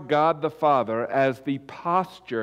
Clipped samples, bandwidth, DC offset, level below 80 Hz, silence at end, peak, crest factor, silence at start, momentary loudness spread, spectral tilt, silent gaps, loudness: under 0.1%; 14.5 kHz; under 0.1%; -68 dBFS; 0 s; -10 dBFS; 14 dB; 0 s; 9 LU; -7 dB/octave; none; -24 LUFS